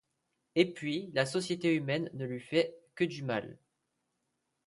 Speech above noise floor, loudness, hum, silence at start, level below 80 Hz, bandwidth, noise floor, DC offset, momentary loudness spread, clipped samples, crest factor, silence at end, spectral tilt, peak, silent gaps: 50 dB; -33 LUFS; none; 0.55 s; -76 dBFS; 11.5 kHz; -82 dBFS; under 0.1%; 7 LU; under 0.1%; 20 dB; 1.1 s; -5.5 dB/octave; -14 dBFS; none